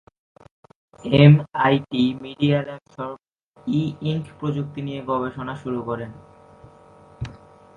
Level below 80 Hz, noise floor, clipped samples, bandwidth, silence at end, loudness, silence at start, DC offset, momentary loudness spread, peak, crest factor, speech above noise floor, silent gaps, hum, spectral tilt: -52 dBFS; -49 dBFS; under 0.1%; 7 kHz; 0.4 s; -21 LUFS; 1.05 s; under 0.1%; 22 LU; 0 dBFS; 22 dB; 28 dB; 3.43-3.52 s; none; -8.5 dB/octave